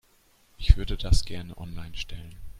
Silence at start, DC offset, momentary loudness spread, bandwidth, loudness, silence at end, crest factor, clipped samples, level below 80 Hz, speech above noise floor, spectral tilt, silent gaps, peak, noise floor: 0.6 s; under 0.1%; 15 LU; 13 kHz; -29 LUFS; 0 s; 24 dB; under 0.1%; -28 dBFS; 35 dB; -5 dB/octave; none; -2 dBFS; -62 dBFS